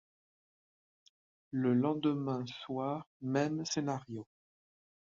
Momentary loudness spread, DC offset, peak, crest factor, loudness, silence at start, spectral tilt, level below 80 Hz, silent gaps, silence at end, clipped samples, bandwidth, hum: 10 LU; under 0.1%; -18 dBFS; 20 dB; -35 LUFS; 1.5 s; -6 dB/octave; -76 dBFS; 3.07-3.20 s; 0.85 s; under 0.1%; 7.6 kHz; none